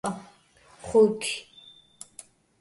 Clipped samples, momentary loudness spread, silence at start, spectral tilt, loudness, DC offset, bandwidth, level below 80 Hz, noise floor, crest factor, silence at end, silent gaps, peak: under 0.1%; 26 LU; 0.05 s; -4 dB/octave; -25 LUFS; under 0.1%; 11.5 kHz; -62 dBFS; -57 dBFS; 20 dB; 1.2 s; none; -10 dBFS